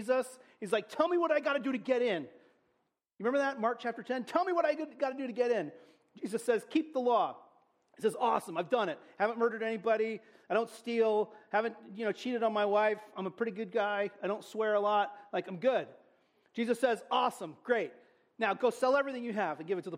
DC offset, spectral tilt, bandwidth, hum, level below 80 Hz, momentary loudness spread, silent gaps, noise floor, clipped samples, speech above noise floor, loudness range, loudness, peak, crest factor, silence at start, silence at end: under 0.1%; -5 dB/octave; 15.5 kHz; none; -84 dBFS; 8 LU; none; -79 dBFS; under 0.1%; 47 dB; 2 LU; -33 LUFS; -16 dBFS; 18 dB; 0 s; 0 s